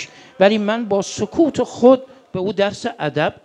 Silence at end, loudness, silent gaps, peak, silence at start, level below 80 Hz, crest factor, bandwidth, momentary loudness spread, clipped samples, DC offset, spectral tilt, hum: 0.15 s; -18 LUFS; none; 0 dBFS; 0 s; -56 dBFS; 18 dB; 9.8 kHz; 10 LU; under 0.1%; under 0.1%; -5.5 dB/octave; none